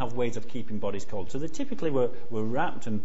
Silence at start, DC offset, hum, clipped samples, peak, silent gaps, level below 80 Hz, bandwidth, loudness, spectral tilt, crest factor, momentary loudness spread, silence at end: 0 s; 8%; none; under 0.1%; -12 dBFS; none; -54 dBFS; 8 kHz; -32 LUFS; -6.5 dB/octave; 16 dB; 8 LU; 0 s